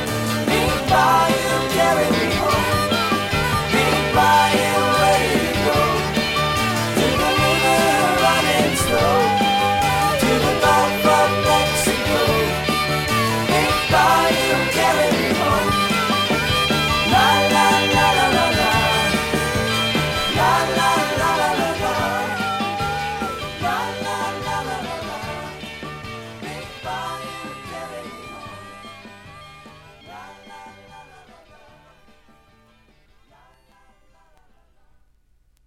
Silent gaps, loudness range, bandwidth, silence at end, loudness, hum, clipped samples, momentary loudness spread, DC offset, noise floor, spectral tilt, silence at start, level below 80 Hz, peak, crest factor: none; 15 LU; 16.5 kHz; 4.65 s; -18 LUFS; none; under 0.1%; 16 LU; under 0.1%; -58 dBFS; -4 dB/octave; 0 s; -40 dBFS; -4 dBFS; 16 dB